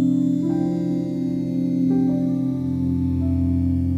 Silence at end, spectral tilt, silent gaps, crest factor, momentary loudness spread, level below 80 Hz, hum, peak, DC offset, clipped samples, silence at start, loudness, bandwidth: 0 s; -10.5 dB/octave; none; 12 dB; 4 LU; -40 dBFS; none; -10 dBFS; under 0.1%; under 0.1%; 0 s; -22 LUFS; 7.6 kHz